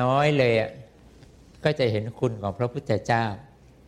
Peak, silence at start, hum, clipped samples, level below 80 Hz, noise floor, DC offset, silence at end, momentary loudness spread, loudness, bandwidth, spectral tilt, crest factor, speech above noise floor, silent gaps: -8 dBFS; 0 s; none; under 0.1%; -56 dBFS; -51 dBFS; under 0.1%; 0.4 s; 10 LU; -25 LUFS; 11.5 kHz; -7 dB/octave; 18 dB; 27 dB; none